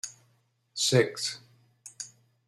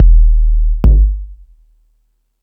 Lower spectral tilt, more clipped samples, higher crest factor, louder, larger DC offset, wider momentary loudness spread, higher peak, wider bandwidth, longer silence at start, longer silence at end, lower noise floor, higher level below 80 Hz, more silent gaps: second, -3.5 dB/octave vs -11 dB/octave; neither; first, 22 dB vs 10 dB; second, -27 LUFS vs -13 LUFS; neither; first, 23 LU vs 14 LU; second, -10 dBFS vs 0 dBFS; first, 14 kHz vs 1.5 kHz; about the same, 0.05 s vs 0 s; second, 0.4 s vs 1.1 s; first, -70 dBFS vs -60 dBFS; second, -72 dBFS vs -10 dBFS; neither